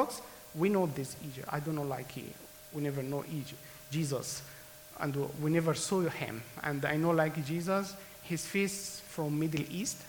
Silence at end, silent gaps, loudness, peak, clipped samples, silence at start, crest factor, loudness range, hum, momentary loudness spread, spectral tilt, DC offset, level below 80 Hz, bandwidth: 0 s; none; -34 LUFS; -14 dBFS; under 0.1%; 0 s; 20 dB; 6 LU; none; 14 LU; -5 dB/octave; under 0.1%; -66 dBFS; 19.5 kHz